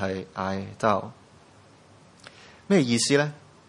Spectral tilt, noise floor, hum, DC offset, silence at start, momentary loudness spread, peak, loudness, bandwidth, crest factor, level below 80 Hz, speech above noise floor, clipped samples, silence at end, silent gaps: -4.5 dB/octave; -54 dBFS; none; under 0.1%; 0 s; 10 LU; -6 dBFS; -25 LUFS; 11.5 kHz; 20 dB; -68 dBFS; 29 dB; under 0.1%; 0.3 s; none